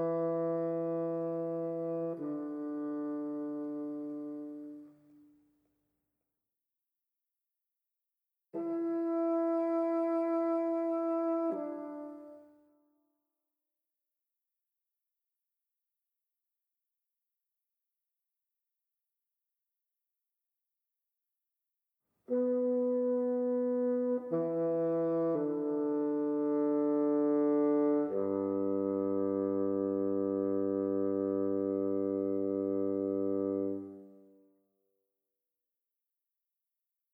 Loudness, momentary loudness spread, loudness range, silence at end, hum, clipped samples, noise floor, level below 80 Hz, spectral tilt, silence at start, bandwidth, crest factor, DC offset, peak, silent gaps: -33 LUFS; 10 LU; 13 LU; 2.95 s; none; under 0.1%; -87 dBFS; -90 dBFS; -11 dB/octave; 0 s; 2.8 kHz; 14 dB; under 0.1%; -20 dBFS; none